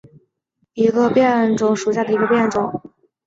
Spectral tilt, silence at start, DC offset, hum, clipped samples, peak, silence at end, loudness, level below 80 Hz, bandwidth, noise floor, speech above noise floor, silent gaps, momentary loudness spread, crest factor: -6 dB/octave; 0.75 s; under 0.1%; none; under 0.1%; -4 dBFS; 0.45 s; -17 LUFS; -58 dBFS; 7.8 kHz; -69 dBFS; 52 dB; none; 10 LU; 16 dB